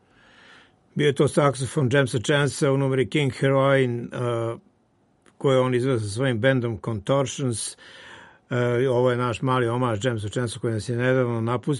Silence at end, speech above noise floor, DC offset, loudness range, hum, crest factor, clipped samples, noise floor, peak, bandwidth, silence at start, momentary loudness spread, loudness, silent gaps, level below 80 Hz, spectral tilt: 0 s; 41 dB; under 0.1%; 3 LU; none; 18 dB; under 0.1%; -64 dBFS; -6 dBFS; 11.5 kHz; 0.95 s; 8 LU; -23 LUFS; none; -58 dBFS; -6 dB/octave